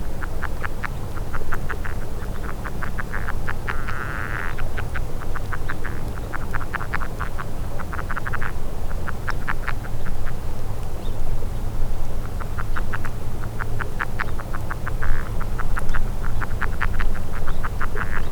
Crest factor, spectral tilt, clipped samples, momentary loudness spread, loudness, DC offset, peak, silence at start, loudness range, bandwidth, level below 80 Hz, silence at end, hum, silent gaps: 16 dB; -6 dB/octave; under 0.1%; 4 LU; -29 LUFS; under 0.1%; -4 dBFS; 0 s; 2 LU; 6.4 kHz; -24 dBFS; 0 s; none; none